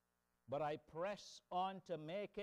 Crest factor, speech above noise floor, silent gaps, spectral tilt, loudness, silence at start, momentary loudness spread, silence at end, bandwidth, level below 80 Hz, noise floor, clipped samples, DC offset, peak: 14 dB; 25 dB; none; -5.5 dB/octave; -47 LUFS; 0.5 s; 5 LU; 0 s; 12.5 kHz; -80 dBFS; -71 dBFS; under 0.1%; under 0.1%; -32 dBFS